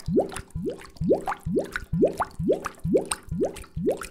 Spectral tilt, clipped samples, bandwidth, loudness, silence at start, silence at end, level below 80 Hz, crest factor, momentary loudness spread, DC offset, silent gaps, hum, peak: -6 dB/octave; under 0.1%; 16 kHz; -27 LUFS; 0 s; 0 s; -44 dBFS; 18 dB; 8 LU; under 0.1%; none; none; -8 dBFS